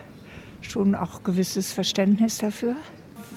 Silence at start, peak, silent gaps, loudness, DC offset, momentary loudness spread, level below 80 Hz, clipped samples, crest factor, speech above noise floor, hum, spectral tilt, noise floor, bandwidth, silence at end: 0 s; -10 dBFS; none; -25 LUFS; under 0.1%; 22 LU; -56 dBFS; under 0.1%; 16 dB; 20 dB; none; -5 dB/octave; -44 dBFS; 16 kHz; 0 s